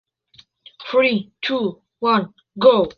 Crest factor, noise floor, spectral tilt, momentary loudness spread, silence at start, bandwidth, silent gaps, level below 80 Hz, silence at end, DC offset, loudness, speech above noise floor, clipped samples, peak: 18 dB; -53 dBFS; -7 dB/octave; 12 LU; 0.8 s; 6.2 kHz; none; -58 dBFS; 0.05 s; under 0.1%; -19 LUFS; 36 dB; under 0.1%; -2 dBFS